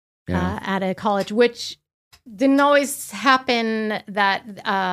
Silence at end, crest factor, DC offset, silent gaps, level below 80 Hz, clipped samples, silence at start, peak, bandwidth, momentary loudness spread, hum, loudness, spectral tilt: 0 s; 20 dB; under 0.1%; 1.94-2.11 s; -50 dBFS; under 0.1%; 0.3 s; 0 dBFS; 16 kHz; 8 LU; none; -20 LUFS; -4.5 dB/octave